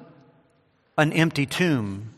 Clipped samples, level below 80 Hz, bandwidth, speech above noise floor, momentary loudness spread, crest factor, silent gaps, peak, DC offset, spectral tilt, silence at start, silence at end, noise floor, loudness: under 0.1%; -62 dBFS; 15 kHz; 41 dB; 6 LU; 22 dB; none; -4 dBFS; under 0.1%; -5.5 dB/octave; 0 s; 0.05 s; -64 dBFS; -23 LUFS